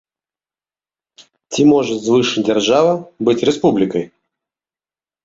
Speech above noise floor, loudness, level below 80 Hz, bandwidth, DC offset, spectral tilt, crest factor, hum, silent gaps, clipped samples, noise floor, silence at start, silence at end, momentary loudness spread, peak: over 76 dB; -15 LUFS; -56 dBFS; 8 kHz; under 0.1%; -5 dB/octave; 14 dB; none; none; under 0.1%; under -90 dBFS; 1.5 s; 1.15 s; 8 LU; -2 dBFS